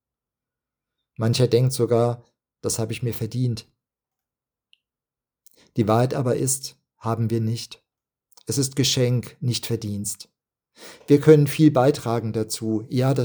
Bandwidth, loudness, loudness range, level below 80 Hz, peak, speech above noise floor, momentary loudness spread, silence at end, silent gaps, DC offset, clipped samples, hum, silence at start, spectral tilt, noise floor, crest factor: over 20 kHz; -22 LUFS; 8 LU; -60 dBFS; -2 dBFS; 69 dB; 15 LU; 0 s; none; under 0.1%; under 0.1%; none; 1.2 s; -5.5 dB/octave; -90 dBFS; 22 dB